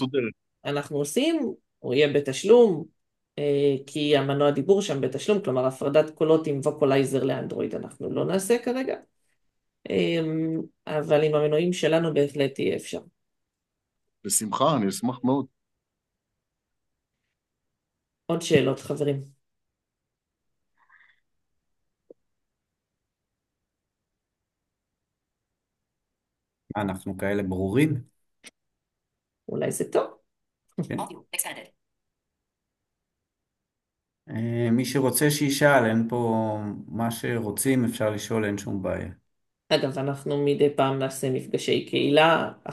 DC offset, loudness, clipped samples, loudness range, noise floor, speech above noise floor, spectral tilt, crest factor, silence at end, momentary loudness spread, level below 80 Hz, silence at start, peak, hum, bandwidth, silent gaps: under 0.1%; -25 LUFS; under 0.1%; 11 LU; -85 dBFS; 61 dB; -5 dB/octave; 22 dB; 0 s; 12 LU; -72 dBFS; 0 s; -4 dBFS; none; 12.5 kHz; none